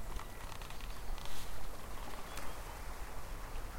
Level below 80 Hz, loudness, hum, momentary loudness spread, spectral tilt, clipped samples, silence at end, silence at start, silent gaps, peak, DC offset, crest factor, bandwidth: -46 dBFS; -48 LUFS; none; 2 LU; -3.5 dB/octave; under 0.1%; 0 s; 0 s; none; -24 dBFS; under 0.1%; 12 dB; 16.5 kHz